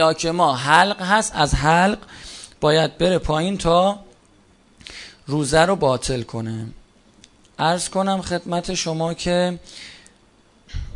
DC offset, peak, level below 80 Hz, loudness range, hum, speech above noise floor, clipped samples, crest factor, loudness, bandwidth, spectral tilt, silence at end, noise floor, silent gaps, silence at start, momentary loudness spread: under 0.1%; 0 dBFS; -38 dBFS; 6 LU; none; 36 dB; under 0.1%; 20 dB; -19 LUFS; 11 kHz; -4.5 dB/octave; 0 s; -55 dBFS; none; 0 s; 20 LU